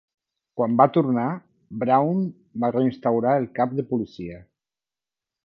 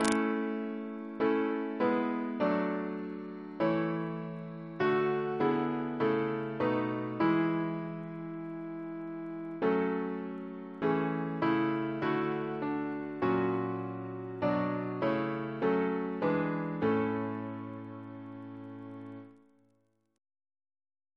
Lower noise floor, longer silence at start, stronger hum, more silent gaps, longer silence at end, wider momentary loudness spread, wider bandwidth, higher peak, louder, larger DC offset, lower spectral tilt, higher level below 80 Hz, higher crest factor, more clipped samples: first, under -90 dBFS vs -74 dBFS; first, 0.55 s vs 0 s; neither; neither; second, 1.05 s vs 1.85 s; first, 18 LU vs 12 LU; second, 5.8 kHz vs 11 kHz; first, -2 dBFS vs -10 dBFS; first, -23 LUFS vs -33 LUFS; neither; first, -10.5 dB/octave vs -7 dB/octave; first, -62 dBFS vs -72 dBFS; about the same, 22 dB vs 22 dB; neither